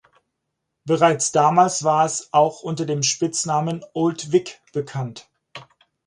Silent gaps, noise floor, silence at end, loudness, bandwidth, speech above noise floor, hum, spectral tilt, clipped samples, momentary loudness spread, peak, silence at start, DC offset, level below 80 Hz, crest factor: none; -78 dBFS; 0.45 s; -20 LUFS; 11.5 kHz; 58 dB; none; -4 dB/octave; under 0.1%; 13 LU; -2 dBFS; 0.85 s; under 0.1%; -66 dBFS; 20 dB